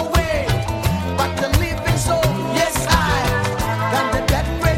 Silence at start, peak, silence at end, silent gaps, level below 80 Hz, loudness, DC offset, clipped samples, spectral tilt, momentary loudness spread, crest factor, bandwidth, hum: 0 s; 0 dBFS; 0 s; none; -28 dBFS; -19 LUFS; under 0.1%; under 0.1%; -4.5 dB/octave; 4 LU; 18 dB; 16.5 kHz; none